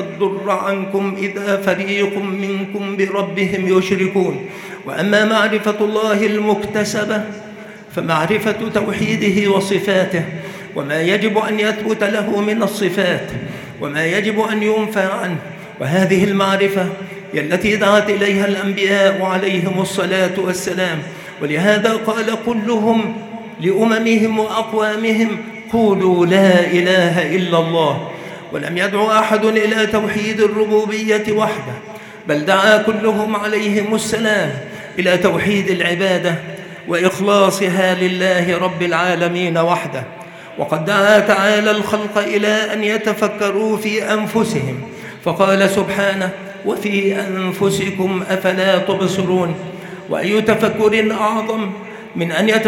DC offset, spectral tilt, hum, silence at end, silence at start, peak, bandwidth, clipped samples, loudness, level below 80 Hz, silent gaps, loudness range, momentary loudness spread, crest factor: under 0.1%; -5 dB/octave; none; 0 s; 0 s; 0 dBFS; 17 kHz; under 0.1%; -16 LUFS; -56 dBFS; none; 3 LU; 12 LU; 16 dB